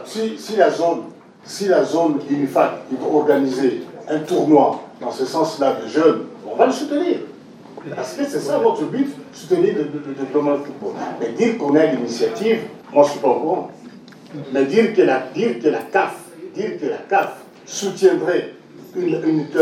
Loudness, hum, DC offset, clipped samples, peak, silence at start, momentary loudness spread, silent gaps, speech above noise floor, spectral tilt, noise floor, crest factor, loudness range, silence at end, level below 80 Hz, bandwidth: -19 LUFS; none; under 0.1%; under 0.1%; 0 dBFS; 0 s; 13 LU; none; 22 dB; -5.5 dB/octave; -40 dBFS; 18 dB; 3 LU; 0 s; -72 dBFS; 15.5 kHz